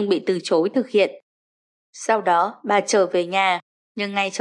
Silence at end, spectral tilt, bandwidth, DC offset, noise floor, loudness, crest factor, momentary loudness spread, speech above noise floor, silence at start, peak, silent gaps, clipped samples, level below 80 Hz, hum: 0 s; -3.5 dB/octave; 11 kHz; under 0.1%; under -90 dBFS; -21 LUFS; 16 dB; 8 LU; over 70 dB; 0 s; -6 dBFS; 1.23-1.93 s, 3.62-3.95 s; under 0.1%; -82 dBFS; none